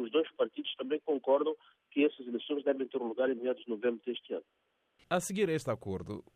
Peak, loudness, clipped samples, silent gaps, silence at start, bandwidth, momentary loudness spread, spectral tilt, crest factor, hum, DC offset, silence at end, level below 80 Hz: -16 dBFS; -34 LUFS; under 0.1%; none; 0 s; 14 kHz; 9 LU; -5 dB/octave; 18 dB; none; under 0.1%; 0.15 s; -74 dBFS